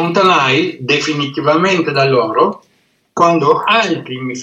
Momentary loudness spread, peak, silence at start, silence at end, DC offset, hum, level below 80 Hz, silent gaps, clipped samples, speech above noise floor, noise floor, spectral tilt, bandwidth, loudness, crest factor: 8 LU; 0 dBFS; 0 s; 0 s; under 0.1%; none; -64 dBFS; none; under 0.1%; 45 dB; -58 dBFS; -5 dB/octave; 9 kHz; -13 LUFS; 14 dB